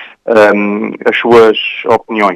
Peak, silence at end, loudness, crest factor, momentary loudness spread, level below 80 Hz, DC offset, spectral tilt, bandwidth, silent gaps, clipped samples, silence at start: 0 dBFS; 0 s; -9 LUFS; 10 dB; 8 LU; -48 dBFS; under 0.1%; -5.5 dB/octave; 11 kHz; none; 2%; 0 s